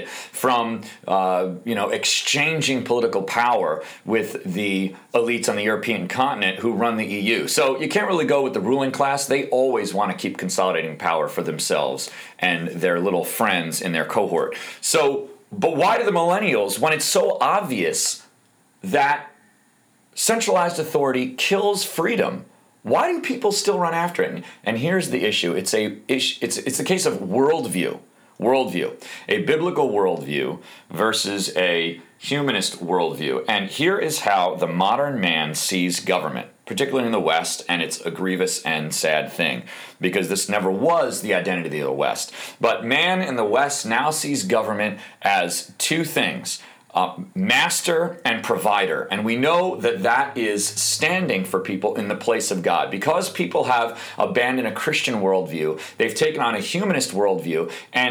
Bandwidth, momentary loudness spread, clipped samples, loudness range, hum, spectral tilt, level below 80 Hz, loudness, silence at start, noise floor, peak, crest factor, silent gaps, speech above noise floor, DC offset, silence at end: over 20 kHz; 7 LU; under 0.1%; 2 LU; none; -3.5 dB/octave; -72 dBFS; -21 LUFS; 0 s; -59 dBFS; -6 dBFS; 16 dB; none; 38 dB; under 0.1%; 0 s